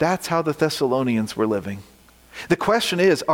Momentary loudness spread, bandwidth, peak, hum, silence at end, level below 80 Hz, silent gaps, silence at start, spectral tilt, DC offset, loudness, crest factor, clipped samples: 17 LU; 17 kHz; -6 dBFS; none; 0 s; -56 dBFS; none; 0 s; -5 dB/octave; under 0.1%; -21 LUFS; 16 dB; under 0.1%